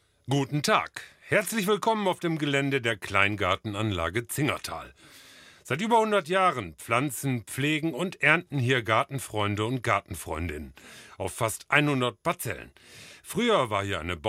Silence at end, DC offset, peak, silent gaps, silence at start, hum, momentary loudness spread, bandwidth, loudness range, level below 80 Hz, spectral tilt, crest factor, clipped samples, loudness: 0 s; under 0.1%; -4 dBFS; none; 0.25 s; none; 13 LU; 16 kHz; 3 LU; -54 dBFS; -4.5 dB/octave; 22 dB; under 0.1%; -27 LUFS